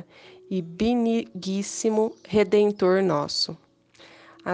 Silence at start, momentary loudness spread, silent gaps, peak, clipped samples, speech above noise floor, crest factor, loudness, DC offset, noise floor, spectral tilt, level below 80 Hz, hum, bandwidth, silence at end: 0.5 s; 11 LU; none; -8 dBFS; under 0.1%; 30 dB; 16 dB; -24 LUFS; under 0.1%; -53 dBFS; -5 dB/octave; -58 dBFS; none; 9.8 kHz; 0 s